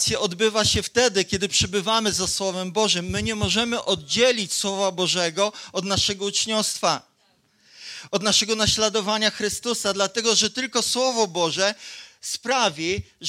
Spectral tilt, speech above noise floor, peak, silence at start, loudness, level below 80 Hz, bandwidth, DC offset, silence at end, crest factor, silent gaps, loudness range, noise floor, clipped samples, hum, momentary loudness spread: -2.5 dB/octave; 41 dB; -2 dBFS; 0 s; -22 LUFS; -48 dBFS; 16 kHz; under 0.1%; 0 s; 20 dB; none; 2 LU; -64 dBFS; under 0.1%; none; 7 LU